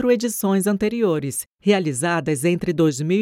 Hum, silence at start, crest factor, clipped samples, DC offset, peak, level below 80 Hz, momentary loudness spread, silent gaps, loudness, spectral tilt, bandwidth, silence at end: none; 0 s; 16 dB; under 0.1%; under 0.1%; -4 dBFS; -56 dBFS; 3 LU; 1.47-1.51 s; -21 LUFS; -5.5 dB/octave; 17 kHz; 0 s